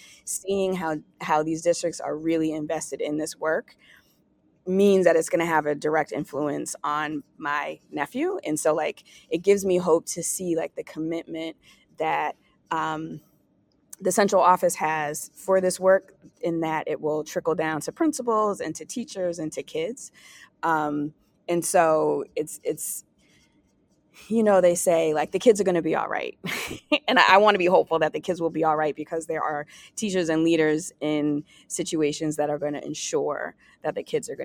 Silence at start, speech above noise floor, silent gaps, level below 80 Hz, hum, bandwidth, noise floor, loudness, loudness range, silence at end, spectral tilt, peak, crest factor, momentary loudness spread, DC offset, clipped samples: 0.25 s; 41 dB; none; -66 dBFS; none; 18 kHz; -65 dBFS; -25 LUFS; 6 LU; 0 s; -4 dB/octave; 0 dBFS; 24 dB; 12 LU; under 0.1%; under 0.1%